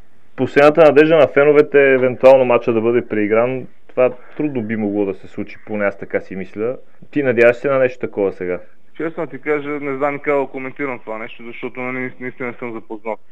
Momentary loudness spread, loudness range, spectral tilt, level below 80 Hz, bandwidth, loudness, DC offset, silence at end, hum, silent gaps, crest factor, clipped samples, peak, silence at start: 18 LU; 11 LU; -7.5 dB/octave; -60 dBFS; 8 kHz; -16 LUFS; 2%; 0.15 s; none; none; 16 dB; under 0.1%; 0 dBFS; 0.4 s